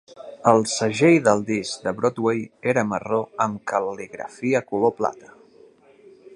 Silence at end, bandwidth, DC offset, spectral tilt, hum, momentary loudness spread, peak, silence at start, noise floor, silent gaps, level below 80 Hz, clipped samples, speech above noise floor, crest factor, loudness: 0 s; 11.5 kHz; under 0.1%; -5 dB/octave; none; 10 LU; -2 dBFS; 0.15 s; -52 dBFS; none; -64 dBFS; under 0.1%; 30 dB; 22 dB; -22 LUFS